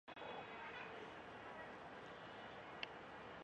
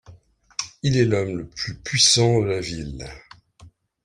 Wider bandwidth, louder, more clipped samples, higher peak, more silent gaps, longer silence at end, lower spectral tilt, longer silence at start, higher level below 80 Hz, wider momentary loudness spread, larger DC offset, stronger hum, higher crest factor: second, 9.6 kHz vs 15 kHz; second, -53 LUFS vs -21 LUFS; neither; second, -26 dBFS vs -4 dBFS; neither; second, 0 s vs 0.35 s; about the same, -4.5 dB/octave vs -3.5 dB/octave; about the same, 0.05 s vs 0.1 s; second, -78 dBFS vs -48 dBFS; second, 4 LU vs 18 LU; neither; neither; first, 28 dB vs 20 dB